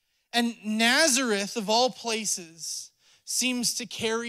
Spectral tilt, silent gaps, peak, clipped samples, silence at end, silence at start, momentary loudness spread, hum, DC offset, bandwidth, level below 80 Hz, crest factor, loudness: -1.5 dB/octave; none; -8 dBFS; under 0.1%; 0 s; 0.35 s; 12 LU; none; under 0.1%; 16 kHz; -74 dBFS; 20 dB; -25 LUFS